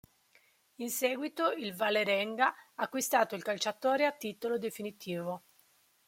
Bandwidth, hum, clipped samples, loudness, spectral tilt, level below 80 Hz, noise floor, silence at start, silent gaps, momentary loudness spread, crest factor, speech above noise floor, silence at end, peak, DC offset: 16.5 kHz; none; under 0.1%; -33 LUFS; -3 dB/octave; -82 dBFS; -68 dBFS; 0.8 s; none; 10 LU; 20 dB; 35 dB; 0.7 s; -14 dBFS; under 0.1%